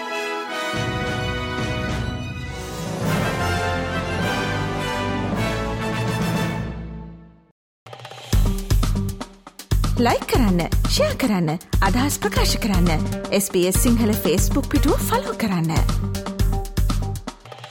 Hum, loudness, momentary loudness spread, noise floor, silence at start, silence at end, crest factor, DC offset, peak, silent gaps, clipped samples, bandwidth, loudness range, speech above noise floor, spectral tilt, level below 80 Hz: none; -22 LUFS; 11 LU; -41 dBFS; 0 s; 0 s; 14 dB; under 0.1%; -8 dBFS; 7.51-7.86 s; under 0.1%; 17.5 kHz; 6 LU; 22 dB; -5 dB/octave; -28 dBFS